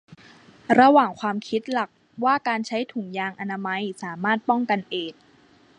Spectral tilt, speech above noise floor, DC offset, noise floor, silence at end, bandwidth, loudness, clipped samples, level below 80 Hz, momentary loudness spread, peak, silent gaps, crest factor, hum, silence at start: -5.5 dB/octave; 33 dB; under 0.1%; -56 dBFS; 0.65 s; 10.5 kHz; -23 LUFS; under 0.1%; -72 dBFS; 14 LU; -2 dBFS; none; 22 dB; none; 0.7 s